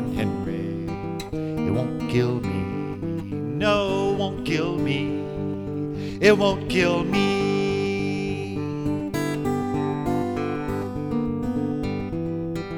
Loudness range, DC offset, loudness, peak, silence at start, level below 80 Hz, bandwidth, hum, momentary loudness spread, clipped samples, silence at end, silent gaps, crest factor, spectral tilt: 4 LU; under 0.1%; -25 LUFS; -4 dBFS; 0 s; -44 dBFS; 17.5 kHz; none; 8 LU; under 0.1%; 0 s; none; 20 dB; -6.5 dB/octave